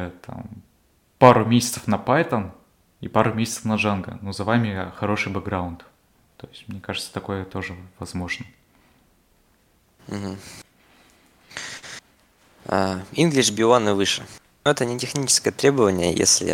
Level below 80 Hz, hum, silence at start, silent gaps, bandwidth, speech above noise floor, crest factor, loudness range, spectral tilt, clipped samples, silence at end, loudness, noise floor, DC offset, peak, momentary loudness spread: -58 dBFS; none; 0 s; none; 17.5 kHz; 40 dB; 24 dB; 17 LU; -4 dB/octave; under 0.1%; 0 s; -21 LUFS; -62 dBFS; under 0.1%; 0 dBFS; 21 LU